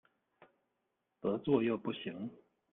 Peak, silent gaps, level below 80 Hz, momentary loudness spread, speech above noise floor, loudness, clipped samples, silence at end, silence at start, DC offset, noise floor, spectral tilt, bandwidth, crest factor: -16 dBFS; none; -76 dBFS; 13 LU; 49 dB; -36 LUFS; under 0.1%; 0.35 s; 1.25 s; under 0.1%; -84 dBFS; -9.5 dB/octave; 4 kHz; 22 dB